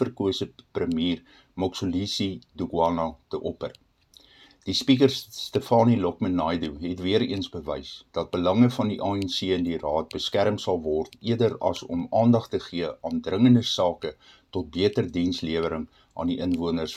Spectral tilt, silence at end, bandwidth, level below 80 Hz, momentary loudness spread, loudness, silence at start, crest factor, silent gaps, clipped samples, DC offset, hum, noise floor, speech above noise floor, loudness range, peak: -6 dB/octave; 0 s; 13 kHz; -56 dBFS; 13 LU; -26 LUFS; 0 s; 20 dB; none; under 0.1%; under 0.1%; none; -57 dBFS; 32 dB; 4 LU; -6 dBFS